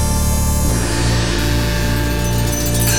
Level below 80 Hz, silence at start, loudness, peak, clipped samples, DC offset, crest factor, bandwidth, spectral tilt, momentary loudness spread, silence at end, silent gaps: -20 dBFS; 0 s; -17 LUFS; -4 dBFS; under 0.1%; 4%; 12 dB; over 20 kHz; -4 dB/octave; 1 LU; 0 s; none